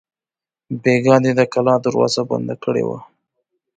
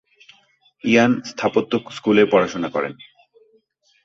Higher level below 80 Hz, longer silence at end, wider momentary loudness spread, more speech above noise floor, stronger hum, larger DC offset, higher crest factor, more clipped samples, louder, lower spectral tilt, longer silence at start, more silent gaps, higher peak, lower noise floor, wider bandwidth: about the same, -60 dBFS vs -60 dBFS; second, 0.75 s vs 1.1 s; about the same, 11 LU vs 10 LU; first, over 74 dB vs 42 dB; neither; neither; about the same, 18 dB vs 18 dB; neither; about the same, -17 LUFS vs -19 LUFS; about the same, -6 dB/octave vs -5.5 dB/octave; second, 0.7 s vs 0.85 s; neither; about the same, 0 dBFS vs -2 dBFS; first, under -90 dBFS vs -61 dBFS; first, 9.2 kHz vs 7.6 kHz